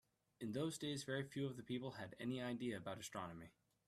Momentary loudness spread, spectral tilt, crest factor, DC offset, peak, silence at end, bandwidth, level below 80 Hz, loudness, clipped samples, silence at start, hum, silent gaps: 8 LU; -5 dB/octave; 18 dB; under 0.1%; -30 dBFS; 0.4 s; 14.5 kHz; -78 dBFS; -47 LUFS; under 0.1%; 0.4 s; none; none